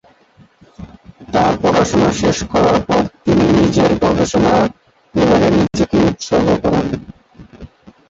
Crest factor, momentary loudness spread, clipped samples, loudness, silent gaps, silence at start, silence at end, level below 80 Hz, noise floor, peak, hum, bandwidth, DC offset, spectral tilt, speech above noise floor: 14 dB; 5 LU; under 0.1%; -14 LUFS; none; 0.8 s; 0.45 s; -36 dBFS; -49 dBFS; -2 dBFS; none; 8 kHz; under 0.1%; -6 dB/octave; 35 dB